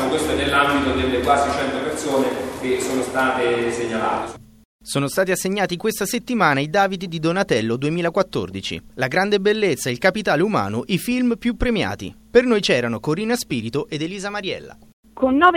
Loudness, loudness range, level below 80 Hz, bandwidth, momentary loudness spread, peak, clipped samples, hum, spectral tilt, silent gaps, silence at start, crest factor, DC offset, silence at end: -20 LUFS; 2 LU; -42 dBFS; 17 kHz; 8 LU; 0 dBFS; under 0.1%; none; -4.5 dB/octave; 4.65-4.79 s, 14.93-15.03 s; 0 s; 20 dB; under 0.1%; 0 s